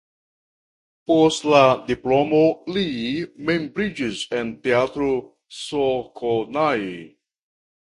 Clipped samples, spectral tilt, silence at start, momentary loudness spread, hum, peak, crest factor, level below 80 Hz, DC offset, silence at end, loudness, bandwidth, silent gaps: under 0.1%; -5 dB/octave; 1.1 s; 11 LU; none; 0 dBFS; 22 dB; -54 dBFS; under 0.1%; 0.75 s; -21 LUFS; 11.5 kHz; none